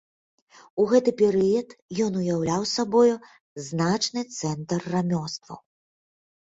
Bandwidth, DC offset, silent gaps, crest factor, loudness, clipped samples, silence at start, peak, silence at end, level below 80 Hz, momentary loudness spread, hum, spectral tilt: 8 kHz; under 0.1%; 1.82-1.89 s, 3.40-3.56 s; 18 dB; -24 LUFS; under 0.1%; 0.75 s; -8 dBFS; 0.9 s; -62 dBFS; 15 LU; none; -5.5 dB/octave